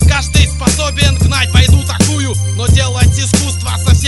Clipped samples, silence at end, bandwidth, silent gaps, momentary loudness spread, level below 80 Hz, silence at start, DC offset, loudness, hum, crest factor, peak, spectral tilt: 0.2%; 0 s; 12 kHz; none; 5 LU; -16 dBFS; 0 s; under 0.1%; -12 LUFS; none; 10 dB; 0 dBFS; -4 dB/octave